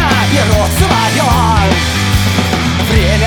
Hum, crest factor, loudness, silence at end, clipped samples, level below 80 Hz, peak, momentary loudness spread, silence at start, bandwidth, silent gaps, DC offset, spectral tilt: none; 10 dB; -11 LUFS; 0 s; under 0.1%; -20 dBFS; 0 dBFS; 2 LU; 0 s; over 20 kHz; none; under 0.1%; -4.5 dB/octave